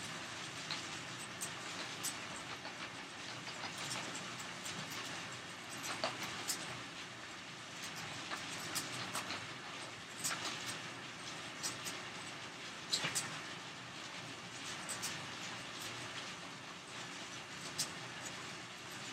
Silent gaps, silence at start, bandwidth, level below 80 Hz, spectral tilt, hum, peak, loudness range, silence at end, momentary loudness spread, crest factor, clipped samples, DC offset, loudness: none; 0 s; 16 kHz; -78 dBFS; -1.5 dB/octave; none; -18 dBFS; 3 LU; 0 s; 7 LU; 26 dB; under 0.1%; under 0.1%; -43 LUFS